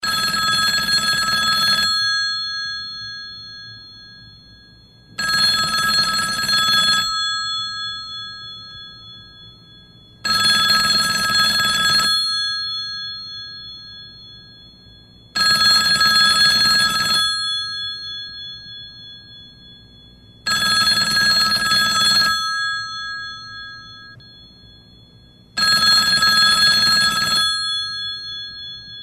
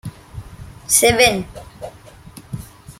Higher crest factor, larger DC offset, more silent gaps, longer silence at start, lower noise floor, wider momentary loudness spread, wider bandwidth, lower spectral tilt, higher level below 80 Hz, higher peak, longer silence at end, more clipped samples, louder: about the same, 16 dB vs 20 dB; neither; neither; about the same, 0 s vs 0.05 s; first, -48 dBFS vs -41 dBFS; second, 21 LU vs 24 LU; second, 14.5 kHz vs 16.5 kHz; second, 0 dB/octave vs -2 dB/octave; second, -50 dBFS vs -42 dBFS; second, -4 dBFS vs 0 dBFS; about the same, 0 s vs 0.1 s; neither; about the same, -15 LUFS vs -14 LUFS